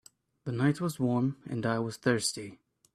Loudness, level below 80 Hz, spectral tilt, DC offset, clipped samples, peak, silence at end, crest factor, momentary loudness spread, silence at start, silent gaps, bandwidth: -31 LUFS; -68 dBFS; -5.5 dB/octave; under 0.1%; under 0.1%; -12 dBFS; 0.4 s; 20 dB; 12 LU; 0.45 s; none; 14.5 kHz